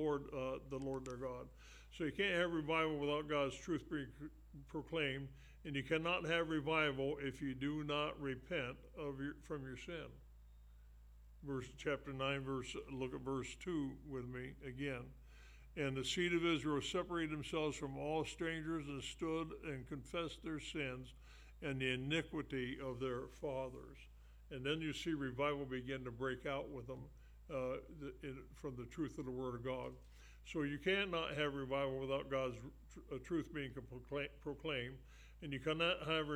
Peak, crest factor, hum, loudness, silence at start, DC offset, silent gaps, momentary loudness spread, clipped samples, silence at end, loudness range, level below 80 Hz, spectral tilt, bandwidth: -22 dBFS; 22 dB; none; -42 LUFS; 0 s; under 0.1%; none; 15 LU; under 0.1%; 0 s; 7 LU; -60 dBFS; -5 dB/octave; 15.5 kHz